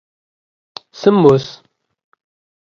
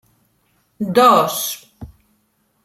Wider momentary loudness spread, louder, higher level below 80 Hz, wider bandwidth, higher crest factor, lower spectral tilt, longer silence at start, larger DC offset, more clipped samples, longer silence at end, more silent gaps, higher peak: first, 25 LU vs 16 LU; about the same, -13 LUFS vs -15 LUFS; about the same, -56 dBFS vs -54 dBFS; second, 7 kHz vs 16 kHz; about the same, 18 dB vs 18 dB; first, -7.5 dB/octave vs -3.5 dB/octave; first, 1 s vs 0.8 s; neither; neither; first, 1.15 s vs 0.8 s; neither; about the same, 0 dBFS vs -2 dBFS